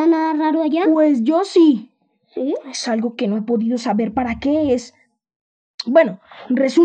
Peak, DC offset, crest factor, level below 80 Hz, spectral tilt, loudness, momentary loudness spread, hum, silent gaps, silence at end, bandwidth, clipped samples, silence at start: -2 dBFS; under 0.1%; 16 dB; -54 dBFS; -5.5 dB/octave; -18 LUFS; 9 LU; none; 5.36-5.78 s; 0 s; 9.2 kHz; under 0.1%; 0 s